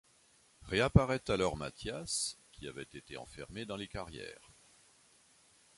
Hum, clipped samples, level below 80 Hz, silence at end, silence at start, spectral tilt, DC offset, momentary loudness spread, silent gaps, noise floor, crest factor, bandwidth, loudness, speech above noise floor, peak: none; under 0.1%; -50 dBFS; 1.45 s; 0.65 s; -5 dB/octave; under 0.1%; 19 LU; none; -67 dBFS; 28 dB; 11.5 kHz; -35 LUFS; 32 dB; -8 dBFS